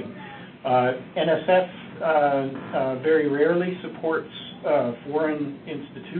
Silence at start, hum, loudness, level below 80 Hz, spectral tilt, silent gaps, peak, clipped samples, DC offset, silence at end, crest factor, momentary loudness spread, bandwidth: 0 s; none; -24 LUFS; -66 dBFS; -10.5 dB/octave; none; -8 dBFS; under 0.1%; under 0.1%; 0 s; 16 dB; 15 LU; 4.4 kHz